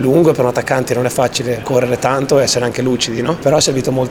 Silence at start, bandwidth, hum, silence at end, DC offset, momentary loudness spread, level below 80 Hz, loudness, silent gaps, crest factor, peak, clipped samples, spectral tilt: 0 s; 19 kHz; none; 0 s; under 0.1%; 4 LU; -44 dBFS; -14 LUFS; none; 14 dB; 0 dBFS; under 0.1%; -4.5 dB/octave